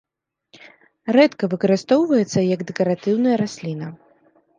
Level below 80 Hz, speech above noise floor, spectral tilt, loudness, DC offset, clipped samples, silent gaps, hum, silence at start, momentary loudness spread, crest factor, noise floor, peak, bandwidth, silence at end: -68 dBFS; 44 dB; -6.5 dB/octave; -19 LUFS; under 0.1%; under 0.1%; none; none; 1.05 s; 13 LU; 18 dB; -62 dBFS; -2 dBFS; 9.4 kHz; 0.65 s